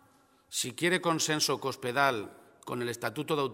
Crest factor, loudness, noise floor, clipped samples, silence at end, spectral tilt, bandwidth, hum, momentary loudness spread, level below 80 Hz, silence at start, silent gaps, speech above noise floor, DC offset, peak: 20 dB; -30 LUFS; -64 dBFS; under 0.1%; 0 s; -3 dB/octave; 16.5 kHz; none; 11 LU; -76 dBFS; 0.5 s; none; 33 dB; under 0.1%; -10 dBFS